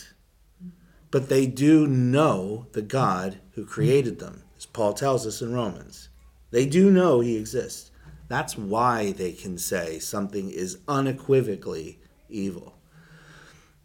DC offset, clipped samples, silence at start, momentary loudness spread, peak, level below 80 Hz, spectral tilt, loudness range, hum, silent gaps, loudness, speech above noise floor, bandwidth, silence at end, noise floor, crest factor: under 0.1%; under 0.1%; 0 s; 18 LU; -8 dBFS; -54 dBFS; -6 dB/octave; 5 LU; none; none; -24 LUFS; 35 dB; 17.5 kHz; 1.15 s; -58 dBFS; 16 dB